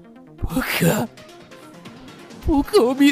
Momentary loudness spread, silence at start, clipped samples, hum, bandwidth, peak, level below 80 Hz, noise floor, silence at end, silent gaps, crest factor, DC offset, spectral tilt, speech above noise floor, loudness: 25 LU; 0.4 s; under 0.1%; none; 16 kHz; -6 dBFS; -36 dBFS; -42 dBFS; 0 s; none; 16 dB; under 0.1%; -5.5 dB/octave; 25 dB; -20 LUFS